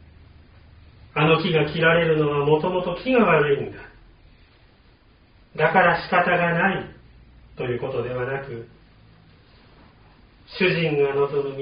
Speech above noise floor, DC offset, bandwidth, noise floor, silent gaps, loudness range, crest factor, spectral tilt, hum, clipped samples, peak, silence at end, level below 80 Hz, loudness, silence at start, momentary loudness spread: 34 dB; under 0.1%; 5.2 kHz; -54 dBFS; none; 11 LU; 20 dB; -4 dB/octave; none; under 0.1%; -4 dBFS; 0 s; -52 dBFS; -21 LUFS; 1.15 s; 14 LU